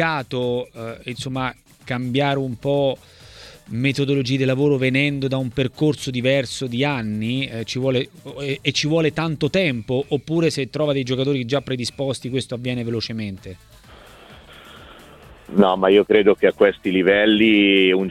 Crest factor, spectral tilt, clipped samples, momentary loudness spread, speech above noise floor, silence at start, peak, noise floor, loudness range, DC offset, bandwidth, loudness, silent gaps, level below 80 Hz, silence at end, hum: 18 dB; -6 dB/octave; under 0.1%; 13 LU; 25 dB; 0 s; -2 dBFS; -45 dBFS; 7 LU; under 0.1%; 14 kHz; -20 LUFS; none; -52 dBFS; 0 s; none